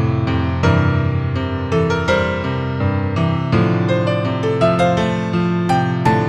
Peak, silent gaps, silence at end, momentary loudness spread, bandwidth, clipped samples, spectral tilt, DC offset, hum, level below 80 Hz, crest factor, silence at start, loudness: -2 dBFS; none; 0 s; 4 LU; 10.5 kHz; under 0.1%; -7.5 dB/octave; under 0.1%; none; -36 dBFS; 14 dB; 0 s; -17 LUFS